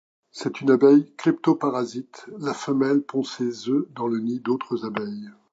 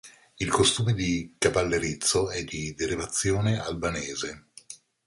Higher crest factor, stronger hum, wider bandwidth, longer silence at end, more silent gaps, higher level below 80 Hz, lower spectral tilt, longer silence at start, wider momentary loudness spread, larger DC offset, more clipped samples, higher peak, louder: about the same, 18 dB vs 20 dB; neither; second, 7.8 kHz vs 11.5 kHz; about the same, 0.2 s vs 0.3 s; neither; second, -76 dBFS vs -46 dBFS; first, -6.5 dB/octave vs -4 dB/octave; first, 0.35 s vs 0.05 s; about the same, 15 LU vs 13 LU; neither; neither; first, -4 dBFS vs -8 dBFS; first, -23 LUFS vs -26 LUFS